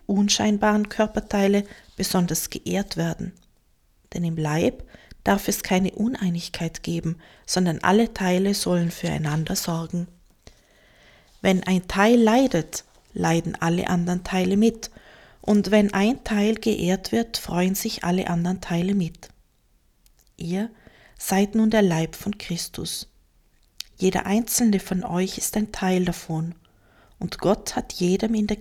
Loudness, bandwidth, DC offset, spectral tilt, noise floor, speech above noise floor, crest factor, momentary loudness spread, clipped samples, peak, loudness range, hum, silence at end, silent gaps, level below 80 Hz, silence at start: -23 LUFS; 17 kHz; under 0.1%; -5 dB/octave; -62 dBFS; 40 dB; 20 dB; 12 LU; under 0.1%; -4 dBFS; 4 LU; none; 0 s; none; -46 dBFS; 0.1 s